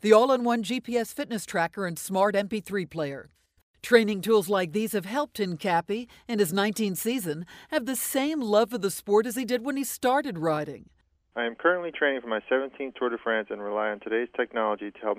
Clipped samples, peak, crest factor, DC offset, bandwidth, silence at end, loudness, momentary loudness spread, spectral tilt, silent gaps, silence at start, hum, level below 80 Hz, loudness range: under 0.1%; -4 dBFS; 22 dB; under 0.1%; 16 kHz; 0 s; -27 LUFS; 9 LU; -4.5 dB/octave; 3.63-3.74 s; 0.05 s; none; -68 dBFS; 3 LU